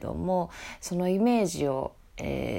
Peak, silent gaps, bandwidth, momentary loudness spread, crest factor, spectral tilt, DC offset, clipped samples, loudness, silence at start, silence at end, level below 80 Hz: -14 dBFS; none; 16 kHz; 14 LU; 14 dB; -6 dB/octave; under 0.1%; under 0.1%; -29 LUFS; 0 s; 0 s; -48 dBFS